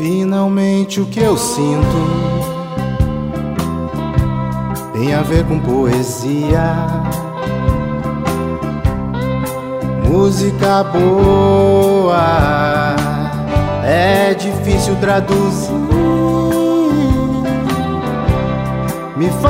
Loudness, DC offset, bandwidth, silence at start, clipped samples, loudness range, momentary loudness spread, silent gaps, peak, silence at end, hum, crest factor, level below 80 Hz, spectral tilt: -15 LUFS; under 0.1%; 16 kHz; 0 s; under 0.1%; 5 LU; 8 LU; none; 0 dBFS; 0 s; none; 14 dB; -26 dBFS; -6.5 dB/octave